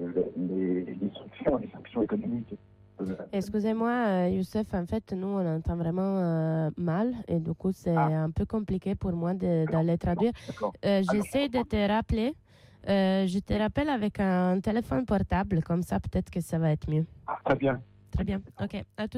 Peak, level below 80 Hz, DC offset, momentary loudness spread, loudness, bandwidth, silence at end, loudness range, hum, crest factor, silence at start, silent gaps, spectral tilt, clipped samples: -14 dBFS; -46 dBFS; under 0.1%; 8 LU; -29 LUFS; 13.5 kHz; 0 s; 3 LU; none; 14 dB; 0 s; none; -8 dB/octave; under 0.1%